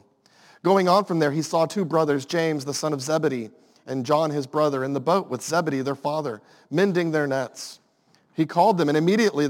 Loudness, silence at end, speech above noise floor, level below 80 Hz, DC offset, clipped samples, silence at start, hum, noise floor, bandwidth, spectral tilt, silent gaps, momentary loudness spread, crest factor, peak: -23 LUFS; 0 s; 40 dB; -78 dBFS; under 0.1%; under 0.1%; 0.65 s; none; -62 dBFS; 17 kHz; -5.5 dB/octave; none; 12 LU; 18 dB; -6 dBFS